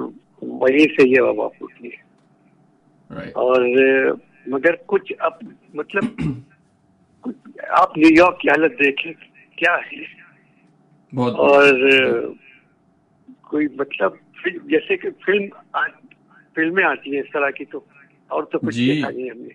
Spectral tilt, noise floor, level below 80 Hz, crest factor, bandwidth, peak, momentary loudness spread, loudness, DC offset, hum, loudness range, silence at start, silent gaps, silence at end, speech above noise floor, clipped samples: -6 dB/octave; -59 dBFS; -58 dBFS; 18 dB; 10.5 kHz; -2 dBFS; 21 LU; -18 LUFS; under 0.1%; none; 6 LU; 0 s; none; 0.05 s; 41 dB; under 0.1%